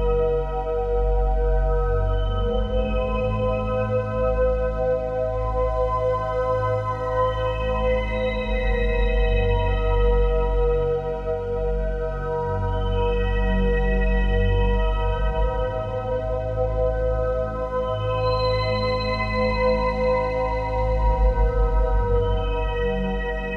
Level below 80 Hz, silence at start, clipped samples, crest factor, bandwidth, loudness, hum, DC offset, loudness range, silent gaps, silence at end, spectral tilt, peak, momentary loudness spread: -24 dBFS; 0 s; under 0.1%; 12 dB; 5.4 kHz; -23 LUFS; none; under 0.1%; 2 LU; none; 0 s; -8 dB/octave; -10 dBFS; 4 LU